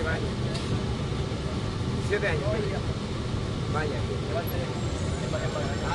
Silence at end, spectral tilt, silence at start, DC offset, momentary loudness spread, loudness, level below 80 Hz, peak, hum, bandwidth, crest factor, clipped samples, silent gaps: 0 s; -6 dB/octave; 0 s; under 0.1%; 4 LU; -29 LUFS; -40 dBFS; -12 dBFS; none; 12 kHz; 16 dB; under 0.1%; none